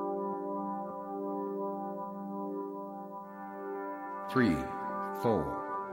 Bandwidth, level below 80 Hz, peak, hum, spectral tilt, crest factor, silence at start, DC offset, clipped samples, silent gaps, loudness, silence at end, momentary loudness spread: 16.5 kHz; -60 dBFS; -14 dBFS; none; -7.5 dB/octave; 22 dB; 0 s; under 0.1%; under 0.1%; none; -36 LUFS; 0 s; 12 LU